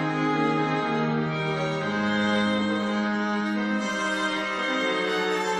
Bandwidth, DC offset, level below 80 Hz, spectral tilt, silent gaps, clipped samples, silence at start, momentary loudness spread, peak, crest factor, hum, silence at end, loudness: 11.5 kHz; under 0.1%; -62 dBFS; -5 dB/octave; none; under 0.1%; 0 s; 3 LU; -12 dBFS; 12 dB; none; 0 s; -25 LUFS